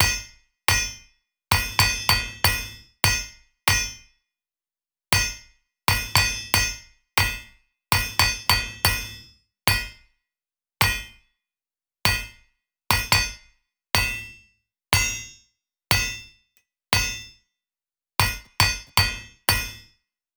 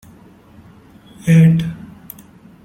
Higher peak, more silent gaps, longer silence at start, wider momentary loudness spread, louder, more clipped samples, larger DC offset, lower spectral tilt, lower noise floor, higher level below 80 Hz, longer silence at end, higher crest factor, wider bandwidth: about the same, -4 dBFS vs -2 dBFS; neither; second, 0 s vs 1.25 s; second, 15 LU vs 26 LU; second, -22 LUFS vs -14 LUFS; neither; neither; second, -1.5 dB/octave vs -8 dB/octave; first, under -90 dBFS vs -44 dBFS; first, -38 dBFS vs -50 dBFS; second, 0.55 s vs 0.9 s; first, 22 dB vs 16 dB; first, over 20 kHz vs 14 kHz